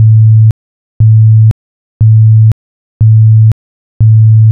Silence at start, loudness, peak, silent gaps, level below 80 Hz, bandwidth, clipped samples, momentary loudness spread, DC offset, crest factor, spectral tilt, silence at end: 0 s; -7 LUFS; 0 dBFS; 0.51-1.00 s, 1.51-2.00 s, 2.52-3.00 s, 3.52-4.00 s; -30 dBFS; 0.7 kHz; 0.4%; 9 LU; under 0.1%; 6 dB; -18.5 dB/octave; 0 s